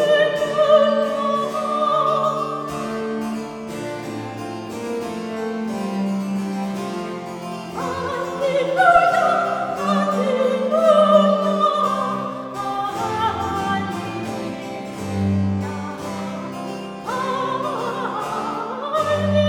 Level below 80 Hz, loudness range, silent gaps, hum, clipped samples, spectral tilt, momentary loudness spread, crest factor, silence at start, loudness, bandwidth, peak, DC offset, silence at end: -56 dBFS; 9 LU; none; none; under 0.1%; -6 dB/octave; 14 LU; 18 dB; 0 s; -21 LUFS; 18 kHz; -2 dBFS; under 0.1%; 0 s